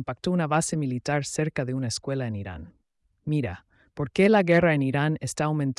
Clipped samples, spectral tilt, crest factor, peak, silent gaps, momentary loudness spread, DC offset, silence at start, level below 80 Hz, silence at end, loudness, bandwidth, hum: under 0.1%; -6 dB/octave; 16 dB; -10 dBFS; none; 15 LU; under 0.1%; 0 s; -56 dBFS; 0.05 s; -25 LUFS; 12 kHz; none